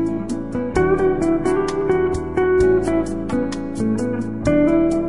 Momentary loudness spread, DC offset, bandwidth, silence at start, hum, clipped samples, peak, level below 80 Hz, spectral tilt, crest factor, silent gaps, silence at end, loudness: 8 LU; 1%; 11 kHz; 0 s; none; under 0.1%; -6 dBFS; -36 dBFS; -7 dB/octave; 14 dB; none; 0 s; -19 LUFS